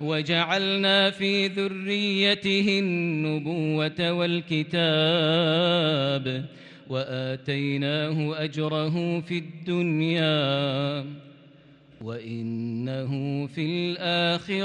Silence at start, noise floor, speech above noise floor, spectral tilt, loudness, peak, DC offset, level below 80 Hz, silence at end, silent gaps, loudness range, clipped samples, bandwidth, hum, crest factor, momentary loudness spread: 0 s; -53 dBFS; 28 dB; -6 dB/octave; -25 LUFS; -10 dBFS; under 0.1%; -68 dBFS; 0 s; none; 6 LU; under 0.1%; 9.6 kHz; none; 16 dB; 10 LU